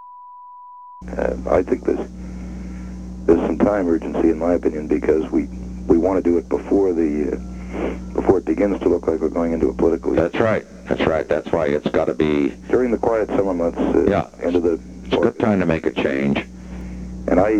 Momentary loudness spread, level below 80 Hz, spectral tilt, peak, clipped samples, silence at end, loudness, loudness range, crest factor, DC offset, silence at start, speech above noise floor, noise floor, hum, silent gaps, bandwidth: 14 LU; -36 dBFS; -7.5 dB/octave; 0 dBFS; under 0.1%; 0 s; -20 LUFS; 2 LU; 18 dB; 0.2%; 0 s; 21 dB; -40 dBFS; none; none; 9.4 kHz